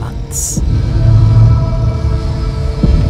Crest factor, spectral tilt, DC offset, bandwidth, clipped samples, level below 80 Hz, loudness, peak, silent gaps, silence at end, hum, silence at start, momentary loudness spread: 10 dB; -6.5 dB/octave; under 0.1%; 15 kHz; 0.1%; -16 dBFS; -13 LUFS; 0 dBFS; none; 0 s; none; 0 s; 9 LU